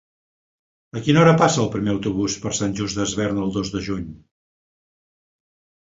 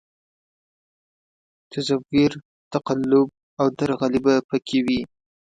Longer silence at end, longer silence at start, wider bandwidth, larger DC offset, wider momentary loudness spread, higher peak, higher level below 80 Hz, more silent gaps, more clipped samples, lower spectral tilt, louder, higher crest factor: first, 1.7 s vs 0.55 s; second, 0.95 s vs 1.7 s; second, 8 kHz vs 9.2 kHz; neither; first, 13 LU vs 10 LU; first, -2 dBFS vs -6 dBFS; first, -48 dBFS vs -56 dBFS; second, none vs 2.45-2.71 s, 3.43-3.57 s, 4.44-4.49 s; neither; about the same, -5 dB/octave vs -6 dB/octave; about the same, -20 LUFS vs -22 LUFS; about the same, 22 dB vs 18 dB